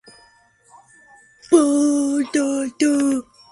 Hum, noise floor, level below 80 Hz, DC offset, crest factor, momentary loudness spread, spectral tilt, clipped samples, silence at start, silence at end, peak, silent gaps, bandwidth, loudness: none; -55 dBFS; -64 dBFS; under 0.1%; 20 dB; 6 LU; -3 dB/octave; under 0.1%; 1.5 s; 0.3 s; -2 dBFS; none; 11.5 kHz; -19 LUFS